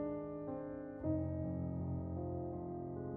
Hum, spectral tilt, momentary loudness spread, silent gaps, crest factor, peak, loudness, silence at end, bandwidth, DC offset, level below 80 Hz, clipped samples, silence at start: none; -12.5 dB/octave; 5 LU; none; 14 dB; -28 dBFS; -42 LUFS; 0 s; 2.5 kHz; under 0.1%; -58 dBFS; under 0.1%; 0 s